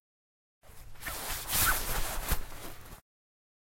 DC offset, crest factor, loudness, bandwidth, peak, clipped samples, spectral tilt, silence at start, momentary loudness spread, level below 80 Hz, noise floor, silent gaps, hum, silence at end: under 0.1%; 20 dB; -32 LUFS; 16.5 kHz; -14 dBFS; under 0.1%; -1.5 dB/octave; 0.65 s; 20 LU; -42 dBFS; under -90 dBFS; none; none; 0.8 s